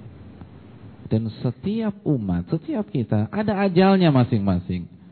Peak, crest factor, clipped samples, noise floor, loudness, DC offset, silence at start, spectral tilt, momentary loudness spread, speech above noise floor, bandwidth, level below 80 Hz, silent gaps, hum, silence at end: -6 dBFS; 16 dB; under 0.1%; -43 dBFS; -22 LUFS; under 0.1%; 0 s; -11.5 dB/octave; 11 LU; 22 dB; 4.5 kHz; -50 dBFS; none; none; 0.25 s